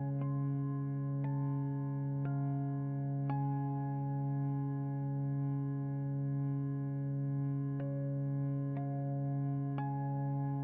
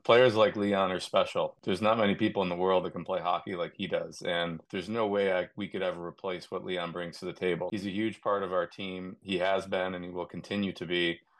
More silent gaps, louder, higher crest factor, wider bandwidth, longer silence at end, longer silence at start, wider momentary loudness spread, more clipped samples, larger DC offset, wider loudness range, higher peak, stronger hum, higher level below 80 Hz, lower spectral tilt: neither; second, -37 LUFS vs -31 LUFS; second, 10 dB vs 22 dB; second, 2.5 kHz vs 12 kHz; second, 0 s vs 0.25 s; about the same, 0 s vs 0.05 s; second, 2 LU vs 11 LU; neither; neither; second, 0 LU vs 5 LU; second, -26 dBFS vs -8 dBFS; neither; about the same, -74 dBFS vs -70 dBFS; first, -12 dB/octave vs -5.5 dB/octave